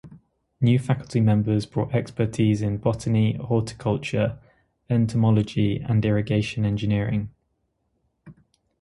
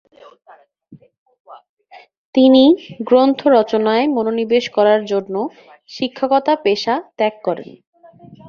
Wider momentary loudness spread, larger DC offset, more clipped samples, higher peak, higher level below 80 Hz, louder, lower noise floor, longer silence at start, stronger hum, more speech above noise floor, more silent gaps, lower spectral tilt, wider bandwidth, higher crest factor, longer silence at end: second, 6 LU vs 13 LU; neither; neither; second, -6 dBFS vs -2 dBFS; first, -48 dBFS vs -62 dBFS; second, -23 LUFS vs -16 LUFS; first, -73 dBFS vs -46 dBFS; second, 0.05 s vs 0.9 s; neither; first, 51 dB vs 31 dB; second, none vs 1.18-1.26 s, 1.40-1.45 s, 1.69-1.77 s, 2.17-2.33 s, 7.87-7.93 s; first, -8 dB/octave vs -5.5 dB/octave; first, 11.5 kHz vs 7 kHz; about the same, 16 dB vs 16 dB; first, 0.5 s vs 0.15 s